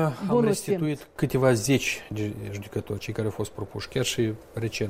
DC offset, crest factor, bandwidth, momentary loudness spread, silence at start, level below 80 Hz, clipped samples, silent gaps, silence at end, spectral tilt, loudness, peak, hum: under 0.1%; 18 dB; 16 kHz; 11 LU; 0 s; -52 dBFS; under 0.1%; none; 0 s; -5 dB/octave; -27 LUFS; -8 dBFS; none